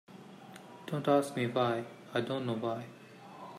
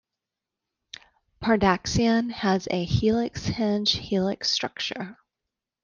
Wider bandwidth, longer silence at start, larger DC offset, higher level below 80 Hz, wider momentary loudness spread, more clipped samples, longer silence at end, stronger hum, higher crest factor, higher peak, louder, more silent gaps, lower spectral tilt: first, 15.5 kHz vs 7.2 kHz; second, 0.1 s vs 1.4 s; neither; second, -80 dBFS vs -48 dBFS; first, 22 LU vs 16 LU; neither; second, 0 s vs 0.7 s; neither; about the same, 20 dB vs 20 dB; second, -16 dBFS vs -6 dBFS; second, -33 LUFS vs -24 LUFS; neither; about the same, -6 dB/octave vs -5 dB/octave